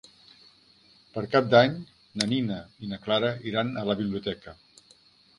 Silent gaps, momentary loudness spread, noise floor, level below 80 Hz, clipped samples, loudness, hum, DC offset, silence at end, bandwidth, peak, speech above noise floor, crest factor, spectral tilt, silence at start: none; 19 LU; -59 dBFS; -62 dBFS; under 0.1%; -26 LUFS; none; under 0.1%; 0.85 s; 11.5 kHz; -4 dBFS; 33 dB; 24 dB; -5.5 dB/octave; 1.15 s